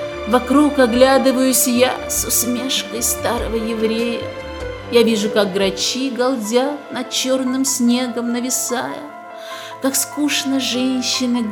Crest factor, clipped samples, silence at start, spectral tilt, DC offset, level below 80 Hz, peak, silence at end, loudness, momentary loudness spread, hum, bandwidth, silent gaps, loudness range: 18 dB; under 0.1%; 0 s; -2.5 dB/octave; under 0.1%; -42 dBFS; 0 dBFS; 0 s; -17 LUFS; 12 LU; none; 18 kHz; none; 4 LU